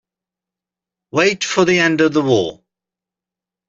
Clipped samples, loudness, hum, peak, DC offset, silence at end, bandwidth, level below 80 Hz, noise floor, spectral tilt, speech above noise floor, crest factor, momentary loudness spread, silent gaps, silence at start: under 0.1%; -15 LUFS; none; -2 dBFS; under 0.1%; 1.15 s; 8 kHz; -58 dBFS; -87 dBFS; -4.5 dB/octave; 72 dB; 16 dB; 7 LU; none; 1.15 s